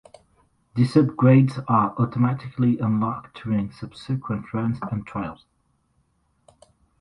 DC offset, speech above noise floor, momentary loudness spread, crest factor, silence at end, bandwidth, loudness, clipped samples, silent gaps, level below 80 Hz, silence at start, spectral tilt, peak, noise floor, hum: under 0.1%; 45 dB; 15 LU; 20 dB; 1.65 s; 11 kHz; -23 LUFS; under 0.1%; none; -56 dBFS; 0.75 s; -9.5 dB/octave; -4 dBFS; -67 dBFS; none